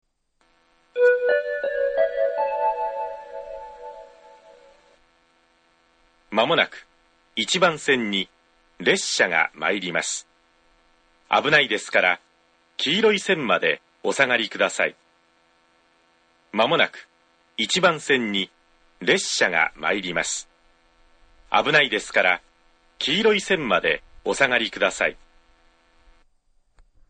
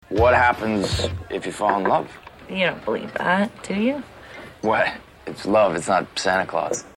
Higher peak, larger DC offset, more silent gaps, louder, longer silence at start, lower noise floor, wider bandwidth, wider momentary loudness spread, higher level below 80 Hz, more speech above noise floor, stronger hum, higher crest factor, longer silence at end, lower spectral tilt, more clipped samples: first, -2 dBFS vs -6 dBFS; neither; neither; about the same, -21 LUFS vs -22 LUFS; first, 0.95 s vs 0.1 s; first, -66 dBFS vs -41 dBFS; second, 9.4 kHz vs 15.5 kHz; second, 12 LU vs 16 LU; second, -60 dBFS vs -42 dBFS; first, 45 dB vs 19 dB; neither; first, 24 dB vs 16 dB; first, 1.95 s vs 0.05 s; second, -2.5 dB/octave vs -4.5 dB/octave; neither